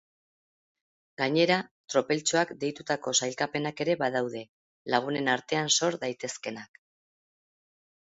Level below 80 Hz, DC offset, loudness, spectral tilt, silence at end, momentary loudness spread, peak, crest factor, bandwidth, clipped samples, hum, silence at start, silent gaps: -74 dBFS; under 0.1%; -28 LUFS; -3 dB/octave; 1.55 s; 11 LU; -8 dBFS; 22 dB; 8 kHz; under 0.1%; none; 1.2 s; 1.71-1.88 s, 4.49-4.85 s